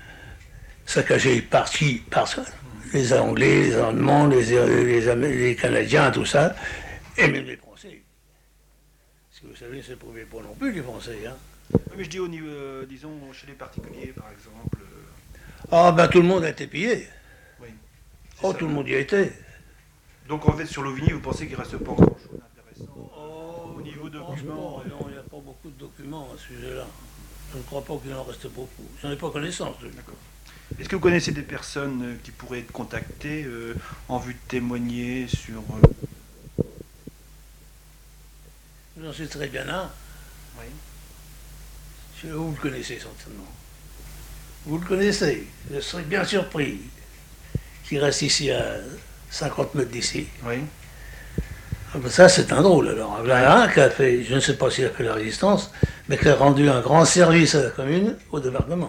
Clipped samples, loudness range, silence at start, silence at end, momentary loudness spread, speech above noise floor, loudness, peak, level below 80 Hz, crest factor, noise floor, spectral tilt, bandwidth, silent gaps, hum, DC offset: under 0.1%; 19 LU; 0 s; 0 s; 24 LU; 37 dB; -21 LUFS; 0 dBFS; -42 dBFS; 24 dB; -59 dBFS; -5 dB/octave; 18 kHz; none; none; under 0.1%